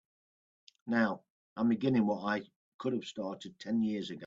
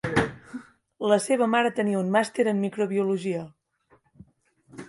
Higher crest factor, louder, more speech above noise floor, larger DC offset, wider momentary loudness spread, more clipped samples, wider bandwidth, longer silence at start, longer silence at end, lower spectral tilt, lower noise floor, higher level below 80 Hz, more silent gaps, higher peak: about the same, 20 dB vs 20 dB; second, -33 LUFS vs -25 LUFS; first, over 57 dB vs 40 dB; neither; second, 14 LU vs 17 LU; neither; second, 7.6 kHz vs 11.5 kHz; first, 0.85 s vs 0.05 s; about the same, 0 s vs 0 s; about the same, -6.5 dB/octave vs -5.5 dB/octave; first, under -90 dBFS vs -64 dBFS; second, -76 dBFS vs -56 dBFS; first, 1.30-1.56 s, 2.56-2.79 s vs none; second, -16 dBFS vs -6 dBFS